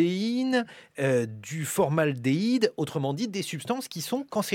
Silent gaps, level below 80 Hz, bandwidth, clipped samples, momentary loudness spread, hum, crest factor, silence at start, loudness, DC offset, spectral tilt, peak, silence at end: none; -70 dBFS; 17 kHz; under 0.1%; 7 LU; none; 18 dB; 0 s; -28 LUFS; under 0.1%; -5.5 dB/octave; -10 dBFS; 0 s